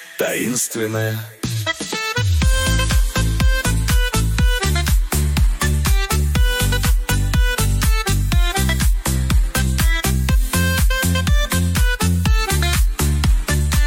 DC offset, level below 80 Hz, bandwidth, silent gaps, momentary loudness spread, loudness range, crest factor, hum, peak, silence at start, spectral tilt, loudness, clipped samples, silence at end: under 0.1%; -18 dBFS; 17 kHz; none; 3 LU; 1 LU; 10 dB; none; -6 dBFS; 0 s; -4 dB/octave; -18 LUFS; under 0.1%; 0 s